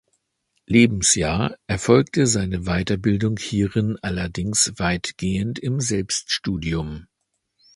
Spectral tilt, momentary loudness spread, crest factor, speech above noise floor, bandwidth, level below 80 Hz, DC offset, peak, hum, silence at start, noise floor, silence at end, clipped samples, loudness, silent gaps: -4.5 dB/octave; 9 LU; 20 dB; 52 dB; 11.5 kHz; -40 dBFS; under 0.1%; -2 dBFS; none; 0.7 s; -73 dBFS; 0.7 s; under 0.1%; -21 LUFS; none